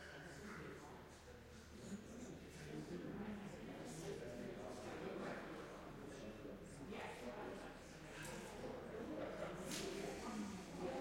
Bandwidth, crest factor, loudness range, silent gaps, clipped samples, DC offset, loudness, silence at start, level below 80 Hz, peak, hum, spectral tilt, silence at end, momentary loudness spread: 16 kHz; 18 dB; 4 LU; none; under 0.1%; under 0.1%; -51 LUFS; 0 s; -68 dBFS; -34 dBFS; none; -5 dB/octave; 0 s; 7 LU